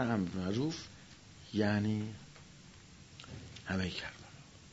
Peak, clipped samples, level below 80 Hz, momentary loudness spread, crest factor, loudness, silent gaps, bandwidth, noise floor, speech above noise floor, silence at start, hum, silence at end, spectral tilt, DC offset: -18 dBFS; under 0.1%; -66 dBFS; 22 LU; 20 dB; -37 LUFS; none; 7.6 kHz; -56 dBFS; 21 dB; 0 s; none; 0 s; -5.5 dB/octave; under 0.1%